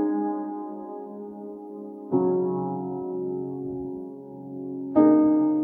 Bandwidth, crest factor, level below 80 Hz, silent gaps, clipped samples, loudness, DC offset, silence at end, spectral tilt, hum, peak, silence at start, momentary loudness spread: 2.3 kHz; 18 dB; -68 dBFS; none; under 0.1%; -25 LUFS; under 0.1%; 0 s; -12.5 dB/octave; none; -6 dBFS; 0 s; 19 LU